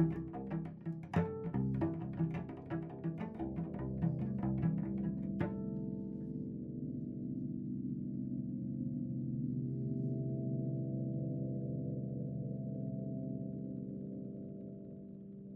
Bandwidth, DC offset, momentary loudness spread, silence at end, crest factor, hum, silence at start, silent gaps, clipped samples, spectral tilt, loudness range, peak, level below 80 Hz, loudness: 3.9 kHz; under 0.1%; 7 LU; 0 s; 18 dB; none; 0 s; none; under 0.1%; -11.5 dB/octave; 3 LU; -20 dBFS; -60 dBFS; -40 LUFS